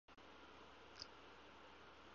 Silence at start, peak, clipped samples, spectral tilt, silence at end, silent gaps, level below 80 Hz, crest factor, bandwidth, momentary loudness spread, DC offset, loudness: 0.05 s; -32 dBFS; under 0.1%; -1.5 dB/octave; 0 s; none; -76 dBFS; 28 dB; 7 kHz; 5 LU; under 0.1%; -60 LUFS